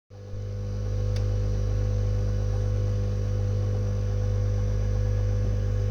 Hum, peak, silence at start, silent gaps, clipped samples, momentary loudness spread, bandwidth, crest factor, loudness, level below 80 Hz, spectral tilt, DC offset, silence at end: 50 Hz at -25 dBFS; -16 dBFS; 0.1 s; none; under 0.1%; 5 LU; 6.8 kHz; 8 dB; -28 LUFS; -30 dBFS; -8 dB/octave; under 0.1%; 0 s